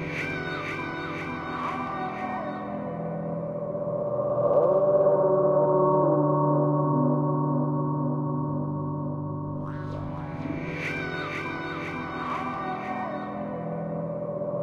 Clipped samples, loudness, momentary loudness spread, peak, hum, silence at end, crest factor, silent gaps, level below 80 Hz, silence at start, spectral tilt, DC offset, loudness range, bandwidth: under 0.1%; -27 LUFS; 11 LU; -10 dBFS; none; 0 s; 16 dB; none; -56 dBFS; 0 s; -8.5 dB/octave; under 0.1%; 9 LU; 6.8 kHz